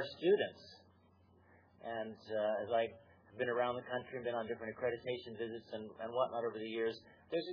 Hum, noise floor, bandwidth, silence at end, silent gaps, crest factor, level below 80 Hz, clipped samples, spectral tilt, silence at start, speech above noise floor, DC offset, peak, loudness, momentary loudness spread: none; -68 dBFS; 5.4 kHz; 0 s; none; 18 dB; -80 dBFS; under 0.1%; -3 dB/octave; 0 s; 29 dB; under 0.1%; -22 dBFS; -39 LUFS; 11 LU